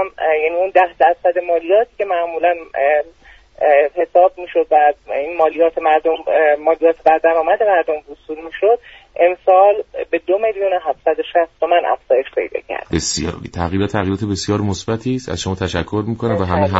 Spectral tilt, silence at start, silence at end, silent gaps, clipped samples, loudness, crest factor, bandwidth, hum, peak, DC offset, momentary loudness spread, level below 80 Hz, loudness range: -5 dB/octave; 0 s; 0 s; none; under 0.1%; -16 LUFS; 16 dB; 8 kHz; none; 0 dBFS; under 0.1%; 9 LU; -44 dBFS; 5 LU